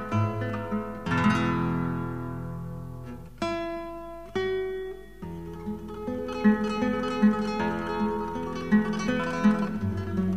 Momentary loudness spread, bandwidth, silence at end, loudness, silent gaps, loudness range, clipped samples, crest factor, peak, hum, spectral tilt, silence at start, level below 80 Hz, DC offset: 14 LU; 11 kHz; 0 s; -28 LUFS; none; 8 LU; under 0.1%; 18 dB; -10 dBFS; none; -7 dB/octave; 0 s; -50 dBFS; 0.4%